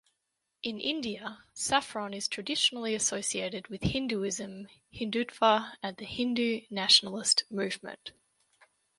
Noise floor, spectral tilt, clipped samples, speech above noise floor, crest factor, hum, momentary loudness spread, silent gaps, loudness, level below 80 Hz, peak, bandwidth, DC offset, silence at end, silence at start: -83 dBFS; -2.5 dB/octave; under 0.1%; 51 dB; 24 dB; none; 14 LU; none; -29 LUFS; -60 dBFS; -8 dBFS; 11.5 kHz; under 0.1%; 0.9 s; 0.65 s